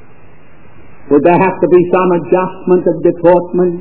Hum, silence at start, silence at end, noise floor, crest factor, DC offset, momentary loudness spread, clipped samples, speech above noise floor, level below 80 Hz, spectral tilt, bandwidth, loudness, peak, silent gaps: none; 1.05 s; 0 s; -42 dBFS; 12 dB; 3%; 5 LU; 0.6%; 32 dB; -48 dBFS; -12.5 dB/octave; 4 kHz; -11 LUFS; 0 dBFS; none